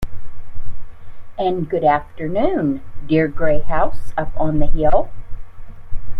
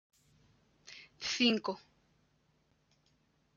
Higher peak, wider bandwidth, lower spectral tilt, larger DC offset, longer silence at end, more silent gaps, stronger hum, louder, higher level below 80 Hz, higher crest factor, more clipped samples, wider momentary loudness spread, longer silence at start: first, 0 dBFS vs -16 dBFS; second, 4 kHz vs 7.4 kHz; first, -8.5 dB/octave vs -3 dB/octave; neither; second, 0 s vs 1.8 s; neither; neither; first, -20 LUFS vs -33 LUFS; first, -26 dBFS vs -78 dBFS; second, 14 dB vs 24 dB; neither; about the same, 22 LU vs 23 LU; second, 0 s vs 0.9 s